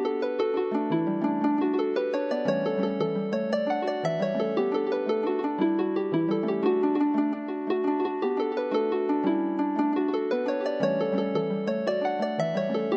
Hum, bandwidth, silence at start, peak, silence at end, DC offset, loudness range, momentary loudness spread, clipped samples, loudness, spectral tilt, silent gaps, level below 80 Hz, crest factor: none; 7.8 kHz; 0 s; -10 dBFS; 0 s; under 0.1%; 1 LU; 3 LU; under 0.1%; -27 LUFS; -7.5 dB/octave; none; -78 dBFS; 16 dB